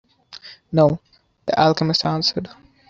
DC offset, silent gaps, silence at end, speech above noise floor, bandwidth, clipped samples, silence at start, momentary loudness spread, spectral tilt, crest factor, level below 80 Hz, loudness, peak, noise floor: under 0.1%; none; 0.45 s; 24 dB; 7.6 kHz; under 0.1%; 0.3 s; 21 LU; -6 dB/octave; 18 dB; -54 dBFS; -19 LUFS; -2 dBFS; -43 dBFS